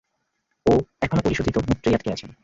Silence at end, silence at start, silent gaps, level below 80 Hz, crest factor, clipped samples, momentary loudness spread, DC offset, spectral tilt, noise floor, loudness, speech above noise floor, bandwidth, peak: 0.1 s; 0.65 s; none; -40 dBFS; 18 dB; under 0.1%; 4 LU; under 0.1%; -7 dB/octave; -74 dBFS; -23 LUFS; 53 dB; 8 kHz; -6 dBFS